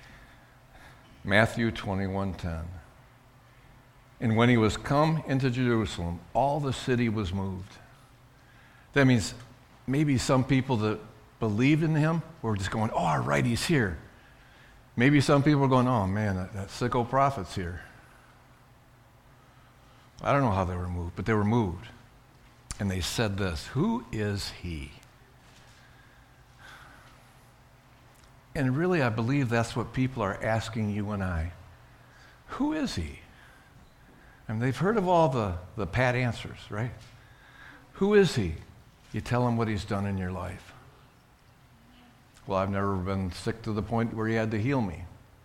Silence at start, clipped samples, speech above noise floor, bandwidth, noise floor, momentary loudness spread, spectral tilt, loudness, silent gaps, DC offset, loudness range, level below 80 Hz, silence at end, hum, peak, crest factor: 0 s; under 0.1%; 31 dB; 15.5 kHz; -58 dBFS; 16 LU; -6.5 dB/octave; -28 LUFS; none; under 0.1%; 8 LU; -50 dBFS; 0.35 s; none; -6 dBFS; 22 dB